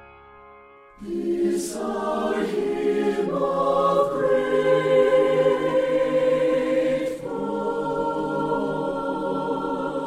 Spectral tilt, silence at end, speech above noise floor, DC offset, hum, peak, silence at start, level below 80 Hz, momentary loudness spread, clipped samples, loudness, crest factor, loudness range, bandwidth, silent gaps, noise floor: -6 dB/octave; 0 s; 23 dB; under 0.1%; none; -8 dBFS; 0 s; -54 dBFS; 8 LU; under 0.1%; -23 LUFS; 16 dB; 5 LU; 13.5 kHz; none; -48 dBFS